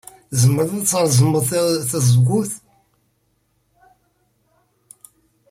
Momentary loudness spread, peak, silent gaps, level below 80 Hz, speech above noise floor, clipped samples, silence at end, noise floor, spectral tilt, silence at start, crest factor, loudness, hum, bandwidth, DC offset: 8 LU; -4 dBFS; none; -54 dBFS; 49 dB; under 0.1%; 2.95 s; -65 dBFS; -5.5 dB/octave; 0.3 s; 16 dB; -17 LUFS; none; 16 kHz; under 0.1%